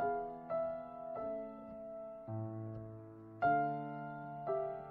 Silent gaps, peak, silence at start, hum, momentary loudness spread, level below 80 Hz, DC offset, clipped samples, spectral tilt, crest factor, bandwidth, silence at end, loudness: none; -22 dBFS; 0 s; none; 14 LU; -70 dBFS; under 0.1%; under 0.1%; -7.5 dB/octave; 18 dB; 4.5 kHz; 0 s; -41 LUFS